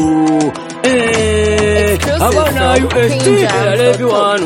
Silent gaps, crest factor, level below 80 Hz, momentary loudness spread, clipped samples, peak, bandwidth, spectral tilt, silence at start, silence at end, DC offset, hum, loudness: none; 12 dB; -28 dBFS; 2 LU; under 0.1%; 0 dBFS; 17 kHz; -5 dB/octave; 0 s; 0 s; under 0.1%; none; -12 LUFS